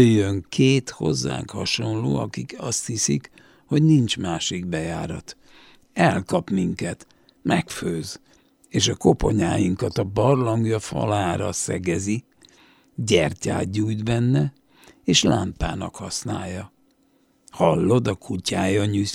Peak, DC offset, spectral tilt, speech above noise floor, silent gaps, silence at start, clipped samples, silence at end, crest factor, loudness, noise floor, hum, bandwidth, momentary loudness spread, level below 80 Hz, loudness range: -2 dBFS; under 0.1%; -5 dB/octave; 40 dB; none; 0 s; under 0.1%; 0 s; 20 dB; -23 LUFS; -62 dBFS; none; 16 kHz; 12 LU; -44 dBFS; 3 LU